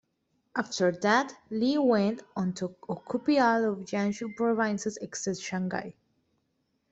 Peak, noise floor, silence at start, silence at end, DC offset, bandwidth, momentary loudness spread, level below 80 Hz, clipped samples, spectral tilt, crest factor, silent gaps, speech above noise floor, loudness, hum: -10 dBFS; -76 dBFS; 0.55 s; 1 s; under 0.1%; 8.2 kHz; 11 LU; -70 dBFS; under 0.1%; -5 dB/octave; 18 dB; none; 48 dB; -29 LUFS; none